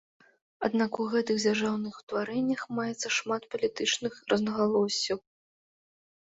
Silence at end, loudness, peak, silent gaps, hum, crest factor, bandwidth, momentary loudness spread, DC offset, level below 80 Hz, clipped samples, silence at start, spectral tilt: 1.1 s; -29 LUFS; -12 dBFS; 2.03-2.07 s; none; 18 dB; 8 kHz; 7 LU; under 0.1%; -70 dBFS; under 0.1%; 0.6 s; -3.5 dB/octave